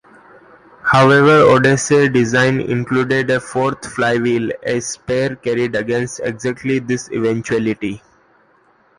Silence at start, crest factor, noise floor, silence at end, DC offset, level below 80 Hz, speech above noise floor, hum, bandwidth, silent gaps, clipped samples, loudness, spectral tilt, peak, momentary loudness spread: 0.85 s; 16 dB; -54 dBFS; 1 s; under 0.1%; -50 dBFS; 39 dB; none; 11.5 kHz; none; under 0.1%; -16 LUFS; -5.5 dB/octave; 0 dBFS; 12 LU